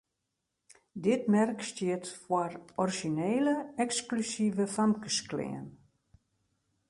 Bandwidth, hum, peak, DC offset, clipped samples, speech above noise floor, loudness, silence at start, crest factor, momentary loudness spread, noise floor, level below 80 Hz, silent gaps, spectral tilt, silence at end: 11.5 kHz; none; -16 dBFS; under 0.1%; under 0.1%; 53 dB; -31 LUFS; 0.95 s; 16 dB; 9 LU; -84 dBFS; -72 dBFS; none; -4.5 dB/octave; 1.15 s